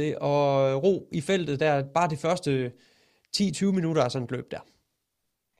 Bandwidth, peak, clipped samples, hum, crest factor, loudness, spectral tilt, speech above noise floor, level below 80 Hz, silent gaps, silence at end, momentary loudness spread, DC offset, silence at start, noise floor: 13 kHz; -10 dBFS; under 0.1%; none; 16 dB; -26 LUFS; -6 dB/octave; 55 dB; -64 dBFS; none; 1 s; 10 LU; under 0.1%; 0 s; -80 dBFS